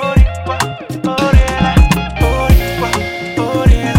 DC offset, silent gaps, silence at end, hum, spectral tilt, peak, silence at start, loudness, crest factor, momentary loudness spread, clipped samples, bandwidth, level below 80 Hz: under 0.1%; none; 0 s; none; -6 dB/octave; 0 dBFS; 0 s; -14 LUFS; 12 dB; 7 LU; under 0.1%; 16.5 kHz; -14 dBFS